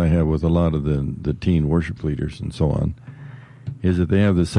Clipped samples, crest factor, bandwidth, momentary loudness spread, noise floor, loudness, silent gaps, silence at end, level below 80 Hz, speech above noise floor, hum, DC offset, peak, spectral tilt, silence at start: under 0.1%; 12 dB; 11 kHz; 18 LU; -39 dBFS; -21 LUFS; none; 0 s; -36 dBFS; 20 dB; none; under 0.1%; -8 dBFS; -8.5 dB/octave; 0 s